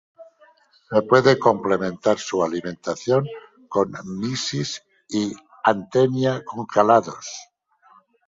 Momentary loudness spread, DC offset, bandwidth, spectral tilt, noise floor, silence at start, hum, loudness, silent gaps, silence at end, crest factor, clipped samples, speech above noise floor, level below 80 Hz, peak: 14 LU; under 0.1%; 7.8 kHz; -5 dB/octave; -56 dBFS; 0.2 s; none; -21 LUFS; none; 0.85 s; 20 dB; under 0.1%; 35 dB; -60 dBFS; -2 dBFS